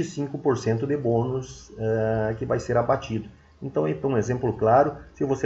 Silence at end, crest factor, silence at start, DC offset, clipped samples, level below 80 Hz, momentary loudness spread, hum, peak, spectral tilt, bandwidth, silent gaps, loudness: 0 s; 18 dB; 0 s; under 0.1%; under 0.1%; -50 dBFS; 12 LU; none; -6 dBFS; -7.5 dB/octave; 8 kHz; none; -25 LUFS